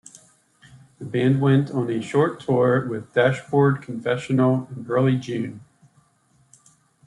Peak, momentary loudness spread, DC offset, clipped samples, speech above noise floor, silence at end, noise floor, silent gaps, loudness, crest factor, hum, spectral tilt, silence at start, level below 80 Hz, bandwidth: -4 dBFS; 8 LU; under 0.1%; under 0.1%; 41 dB; 1.45 s; -61 dBFS; none; -22 LUFS; 18 dB; none; -7.5 dB/octave; 0.75 s; -64 dBFS; 11 kHz